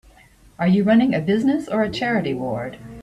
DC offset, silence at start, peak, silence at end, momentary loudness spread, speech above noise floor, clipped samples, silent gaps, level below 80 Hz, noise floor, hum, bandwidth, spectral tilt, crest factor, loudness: under 0.1%; 0.6 s; -6 dBFS; 0 s; 11 LU; 31 dB; under 0.1%; none; -52 dBFS; -51 dBFS; none; 11 kHz; -7.5 dB/octave; 14 dB; -20 LUFS